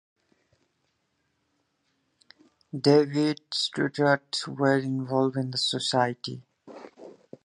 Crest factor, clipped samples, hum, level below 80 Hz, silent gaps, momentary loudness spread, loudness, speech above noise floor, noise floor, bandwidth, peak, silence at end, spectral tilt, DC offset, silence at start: 22 dB; under 0.1%; none; -74 dBFS; none; 21 LU; -25 LUFS; 50 dB; -75 dBFS; 11 kHz; -6 dBFS; 0.35 s; -5 dB/octave; under 0.1%; 2.75 s